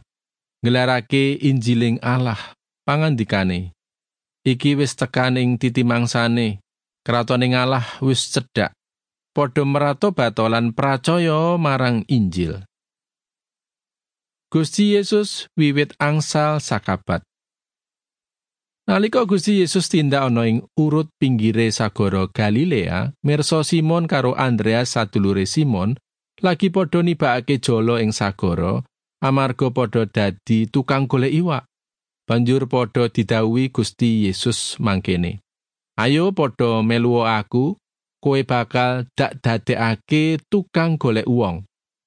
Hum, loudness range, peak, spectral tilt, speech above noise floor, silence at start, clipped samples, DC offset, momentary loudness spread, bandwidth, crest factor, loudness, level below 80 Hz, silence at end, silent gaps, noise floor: none; 3 LU; -2 dBFS; -6 dB/octave; over 72 dB; 0.65 s; under 0.1%; under 0.1%; 6 LU; 10.5 kHz; 16 dB; -19 LUFS; -52 dBFS; 0.4 s; none; under -90 dBFS